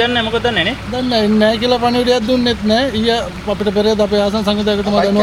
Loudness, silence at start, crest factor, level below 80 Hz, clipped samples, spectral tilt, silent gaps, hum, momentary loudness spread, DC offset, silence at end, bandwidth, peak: -15 LUFS; 0 s; 14 dB; -36 dBFS; under 0.1%; -5 dB/octave; none; none; 4 LU; under 0.1%; 0 s; 14.5 kHz; 0 dBFS